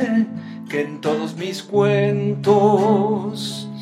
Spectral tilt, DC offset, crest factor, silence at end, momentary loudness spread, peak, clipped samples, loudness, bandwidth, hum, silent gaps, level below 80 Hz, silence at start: -6.5 dB/octave; under 0.1%; 18 dB; 0 s; 12 LU; -2 dBFS; under 0.1%; -19 LUFS; 13.5 kHz; none; none; -66 dBFS; 0 s